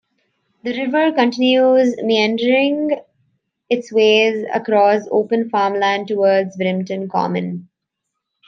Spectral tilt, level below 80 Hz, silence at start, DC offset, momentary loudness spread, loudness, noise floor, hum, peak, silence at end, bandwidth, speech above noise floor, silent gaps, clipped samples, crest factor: -5.5 dB/octave; -70 dBFS; 0.65 s; under 0.1%; 10 LU; -16 LUFS; -78 dBFS; none; -2 dBFS; 0.85 s; 7.4 kHz; 62 dB; none; under 0.1%; 16 dB